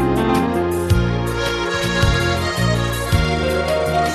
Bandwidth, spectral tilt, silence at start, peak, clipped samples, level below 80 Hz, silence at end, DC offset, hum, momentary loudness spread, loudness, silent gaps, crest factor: 14 kHz; -5.5 dB/octave; 0 s; -4 dBFS; under 0.1%; -28 dBFS; 0 s; under 0.1%; none; 3 LU; -18 LUFS; none; 14 dB